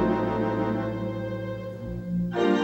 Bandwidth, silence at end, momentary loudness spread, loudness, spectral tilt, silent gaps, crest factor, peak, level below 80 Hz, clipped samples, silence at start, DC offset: 16.5 kHz; 0 s; 10 LU; -28 LUFS; -8 dB/octave; none; 14 dB; -12 dBFS; -46 dBFS; under 0.1%; 0 s; under 0.1%